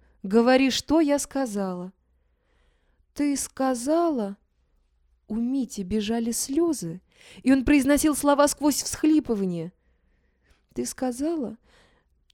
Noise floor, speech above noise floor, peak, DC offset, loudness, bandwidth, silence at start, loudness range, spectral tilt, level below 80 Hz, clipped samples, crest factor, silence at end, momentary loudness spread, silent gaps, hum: -67 dBFS; 44 dB; -6 dBFS; under 0.1%; -24 LUFS; 18 kHz; 0.25 s; 6 LU; -4 dB/octave; -50 dBFS; under 0.1%; 20 dB; 0.8 s; 15 LU; none; none